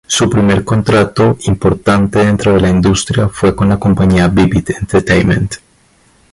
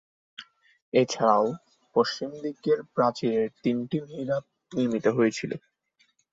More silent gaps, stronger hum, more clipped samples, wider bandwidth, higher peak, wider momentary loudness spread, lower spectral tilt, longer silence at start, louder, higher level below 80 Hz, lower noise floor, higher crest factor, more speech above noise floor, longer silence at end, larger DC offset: second, none vs 0.82-0.92 s; neither; neither; first, 11.5 kHz vs 7.8 kHz; first, 0 dBFS vs -6 dBFS; second, 4 LU vs 15 LU; about the same, -6 dB/octave vs -5.5 dB/octave; second, 0.1 s vs 0.4 s; first, -11 LUFS vs -27 LUFS; first, -28 dBFS vs -70 dBFS; second, -50 dBFS vs -69 dBFS; second, 10 dB vs 20 dB; second, 39 dB vs 43 dB; about the same, 0.75 s vs 0.75 s; neither